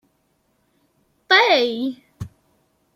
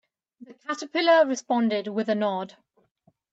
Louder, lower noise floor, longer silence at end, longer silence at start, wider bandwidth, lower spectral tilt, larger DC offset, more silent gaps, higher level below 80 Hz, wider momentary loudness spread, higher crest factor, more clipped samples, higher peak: first, -17 LUFS vs -24 LUFS; about the same, -66 dBFS vs -66 dBFS; second, 0.7 s vs 0.85 s; first, 1.3 s vs 0.4 s; first, 15.5 kHz vs 8 kHz; about the same, -4 dB/octave vs -4.5 dB/octave; neither; neither; first, -58 dBFS vs -82 dBFS; first, 24 LU vs 14 LU; about the same, 20 dB vs 18 dB; neither; first, -2 dBFS vs -8 dBFS